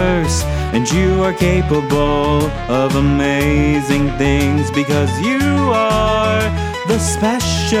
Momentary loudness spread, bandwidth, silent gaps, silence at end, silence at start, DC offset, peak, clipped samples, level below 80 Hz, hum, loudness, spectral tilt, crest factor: 3 LU; 16 kHz; none; 0 s; 0 s; under 0.1%; -2 dBFS; under 0.1%; -26 dBFS; none; -15 LUFS; -5.5 dB/octave; 14 dB